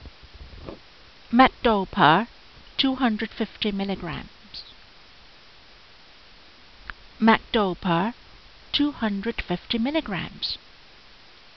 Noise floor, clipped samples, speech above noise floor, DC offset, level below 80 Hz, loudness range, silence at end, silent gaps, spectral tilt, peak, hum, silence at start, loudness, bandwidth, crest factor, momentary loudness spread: -51 dBFS; under 0.1%; 28 dB; 0.2%; -48 dBFS; 11 LU; 1 s; none; -3 dB/octave; -4 dBFS; none; 0 s; -24 LUFS; 6.2 kHz; 22 dB; 23 LU